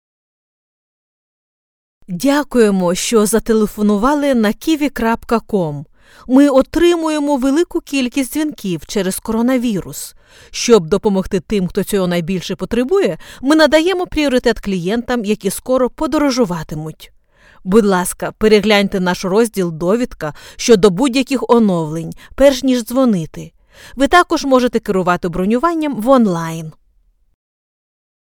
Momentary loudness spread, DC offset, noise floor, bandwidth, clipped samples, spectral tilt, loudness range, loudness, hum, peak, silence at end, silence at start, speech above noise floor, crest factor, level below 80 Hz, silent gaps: 11 LU; under 0.1%; -55 dBFS; 19.5 kHz; under 0.1%; -5 dB/octave; 3 LU; -15 LUFS; none; 0 dBFS; 1.6 s; 2.1 s; 41 dB; 16 dB; -38 dBFS; none